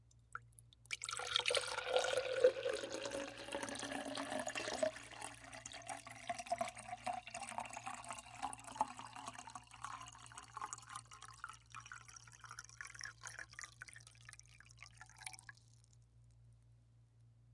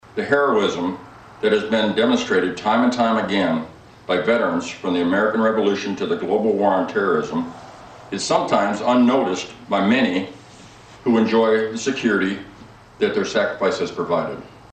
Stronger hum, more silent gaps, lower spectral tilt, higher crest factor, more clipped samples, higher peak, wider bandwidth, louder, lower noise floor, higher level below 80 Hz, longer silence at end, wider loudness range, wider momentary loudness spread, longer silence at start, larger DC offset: neither; neither; second, -2 dB/octave vs -5 dB/octave; first, 28 dB vs 16 dB; neither; second, -16 dBFS vs -4 dBFS; first, 11.5 kHz vs 9 kHz; second, -44 LUFS vs -20 LUFS; first, -68 dBFS vs -43 dBFS; second, -72 dBFS vs -56 dBFS; second, 0 s vs 0.15 s; first, 15 LU vs 2 LU; first, 19 LU vs 10 LU; second, 0 s vs 0.15 s; neither